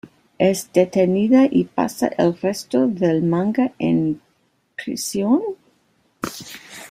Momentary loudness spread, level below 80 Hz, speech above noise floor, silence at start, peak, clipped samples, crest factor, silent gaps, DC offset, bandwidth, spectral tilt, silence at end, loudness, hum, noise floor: 16 LU; -60 dBFS; 46 dB; 0.05 s; -2 dBFS; under 0.1%; 18 dB; none; under 0.1%; 16 kHz; -6 dB/octave; 0.05 s; -19 LUFS; none; -64 dBFS